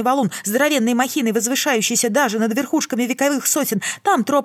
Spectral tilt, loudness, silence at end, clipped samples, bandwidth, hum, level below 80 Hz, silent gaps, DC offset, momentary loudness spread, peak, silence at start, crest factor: -3 dB/octave; -18 LUFS; 0 s; under 0.1%; 19 kHz; none; -80 dBFS; none; under 0.1%; 4 LU; -4 dBFS; 0 s; 14 dB